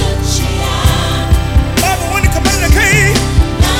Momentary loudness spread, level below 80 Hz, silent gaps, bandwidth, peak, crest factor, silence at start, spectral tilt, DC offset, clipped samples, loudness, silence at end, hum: 6 LU; -16 dBFS; none; 17 kHz; 0 dBFS; 10 dB; 0 s; -4 dB/octave; under 0.1%; 0.3%; -12 LUFS; 0 s; none